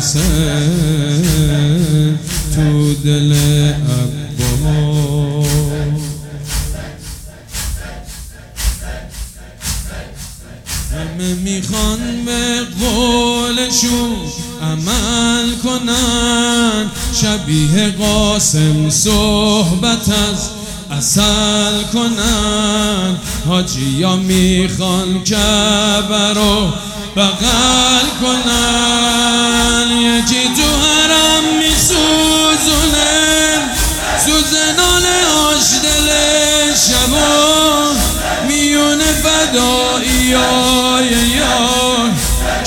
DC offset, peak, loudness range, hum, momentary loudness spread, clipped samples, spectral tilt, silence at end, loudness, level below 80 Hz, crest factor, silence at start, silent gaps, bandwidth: under 0.1%; 0 dBFS; 10 LU; none; 12 LU; under 0.1%; -3.5 dB/octave; 0 s; -12 LUFS; -26 dBFS; 14 dB; 0 s; none; 19 kHz